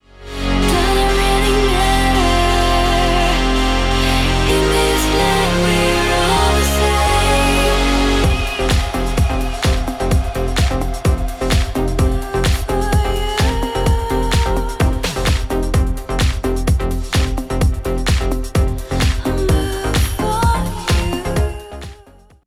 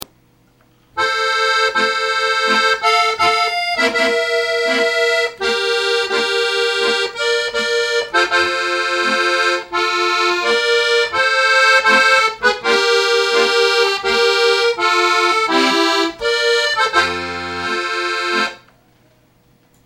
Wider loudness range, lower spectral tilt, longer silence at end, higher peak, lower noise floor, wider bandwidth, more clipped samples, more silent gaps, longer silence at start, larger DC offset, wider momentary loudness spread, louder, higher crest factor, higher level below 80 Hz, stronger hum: about the same, 4 LU vs 4 LU; first, -4.5 dB/octave vs -1 dB/octave; second, 0.5 s vs 1.3 s; about the same, -2 dBFS vs -2 dBFS; second, -45 dBFS vs -54 dBFS; about the same, 16 kHz vs 16 kHz; neither; neither; second, 0.2 s vs 0.95 s; neither; about the same, 5 LU vs 5 LU; about the same, -16 LUFS vs -15 LUFS; about the same, 14 dB vs 14 dB; first, -20 dBFS vs -56 dBFS; neither